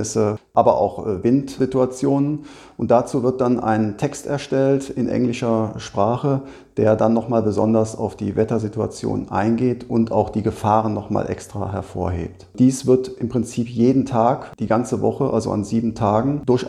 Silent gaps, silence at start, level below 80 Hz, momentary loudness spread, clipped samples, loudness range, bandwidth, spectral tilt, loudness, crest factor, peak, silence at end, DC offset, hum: none; 0 s; -48 dBFS; 8 LU; under 0.1%; 2 LU; 12.5 kHz; -7 dB/octave; -20 LUFS; 18 dB; -2 dBFS; 0 s; under 0.1%; none